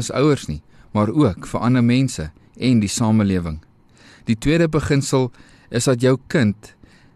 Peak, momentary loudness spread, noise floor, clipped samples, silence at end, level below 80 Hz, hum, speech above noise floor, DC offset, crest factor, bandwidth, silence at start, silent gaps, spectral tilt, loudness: -6 dBFS; 13 LU; -49 dBFS; under 0.1%; 0.5 s; -42 dBFS; none; 31 dB; under 0.1%; 14 dB; 13 kHz; 0 s; none; -6 dB/octave; -19 LUFS